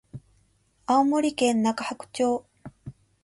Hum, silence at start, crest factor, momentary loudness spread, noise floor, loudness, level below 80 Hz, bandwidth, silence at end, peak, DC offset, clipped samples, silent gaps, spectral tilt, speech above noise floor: none; 0.15 s; 16 dB; 24 LU; -65 dBFS; -25 LUFS; -62 dBFS; 11.5 kHz; 0.35 s; -10 dBFS; under 0.1%; under 0.1%; none; -4.5 dB/octave; 41 dB